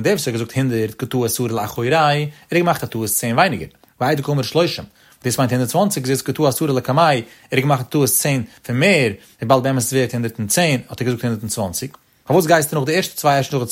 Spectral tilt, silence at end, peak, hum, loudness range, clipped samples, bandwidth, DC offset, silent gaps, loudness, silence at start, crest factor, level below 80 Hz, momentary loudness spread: -4.5 dB/octave; 0 s; -2 dBFS; none; 2 LU; under 0.1%; 16.5 kHz; under 0.1%; none; -18 LUFS; 0 s; 18 dB; -54 dBFS; 7 LU